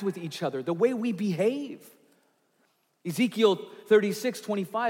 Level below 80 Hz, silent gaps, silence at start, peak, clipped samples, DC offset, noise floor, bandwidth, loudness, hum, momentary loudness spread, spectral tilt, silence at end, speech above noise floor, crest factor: -84 dBFS; none; 0 s; -10 dBFS; under 0.1%; under 0.1%; -70 dBFS; 17 kHz; -27 LUFS; none; 12 LU; -5.5 dB/octave; 0 s; 43 dB; 18 dB